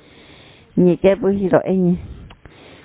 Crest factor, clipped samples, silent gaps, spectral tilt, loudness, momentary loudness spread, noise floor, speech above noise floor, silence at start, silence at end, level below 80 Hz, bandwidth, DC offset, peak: 18 dB; under 0.1%; none; -12.5 dB/octave; -17 LUFS; 10 LU; -45 dBFS; 30 dB; 0.75 s; 0.55 s; -44 dBFS; 4 kHz; under 0.1%; 0 dBFS